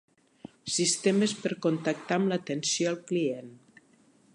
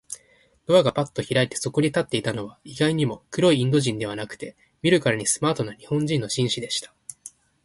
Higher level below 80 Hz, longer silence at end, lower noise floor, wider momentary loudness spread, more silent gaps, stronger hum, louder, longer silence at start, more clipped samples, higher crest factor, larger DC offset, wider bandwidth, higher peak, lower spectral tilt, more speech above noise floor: second, -78 dBFS vs -58 dBFS; first, 0.8 s vs 0.35 s; about the same, -62 dBFS vs -60 dBFS; second, 7 LU vs 19 LU; neither; neither; second, -28 LUFS vs -23 LUFS; first, 0.65 s vs 0.1 s; neither; about the same, 18 dB vs 18 dB; neither; about the same, 11.5 kHz vs 11.5 kHz; second, -12 dBFS vs -6 dBFS; about the same, -4 dB/octave vs -4.5 dB/octave; about the same, 34 dB vs 37 dB